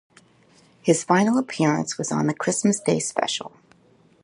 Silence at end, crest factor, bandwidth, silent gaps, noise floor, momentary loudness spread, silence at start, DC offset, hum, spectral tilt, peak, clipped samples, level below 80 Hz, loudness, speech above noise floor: 0.75 s; 20 dB; 11.5 kHz; none; -57 dBFS; 8 LU; 0.85 s; under 0.1%; none; -4.5 dB/octave; -4 dBFS; under 0.1%; -68 dBFS; -22 LUFS; 35 dB